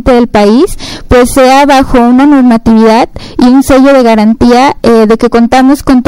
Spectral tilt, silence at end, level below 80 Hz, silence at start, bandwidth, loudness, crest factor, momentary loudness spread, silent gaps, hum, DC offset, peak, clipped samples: -5.5 dB/octave; 0.05 s; -22 dBFS; 0 s; 16.5 kHz; -5 LUFS; 4 dB; 5 LU; none; none; under 0.1%; 0 dBFS; 7%